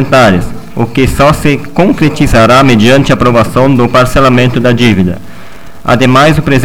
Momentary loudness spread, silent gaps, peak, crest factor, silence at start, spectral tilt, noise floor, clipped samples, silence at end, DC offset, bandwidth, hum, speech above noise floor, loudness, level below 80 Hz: 9 LU; none; 0 dBFS; 8 dB; 0 s; -6 dB/octave; -31 dBFS; 2%; 0 s; 8%; 17 kHz; none; 24 dB; -7 LUFS; -24 dBFS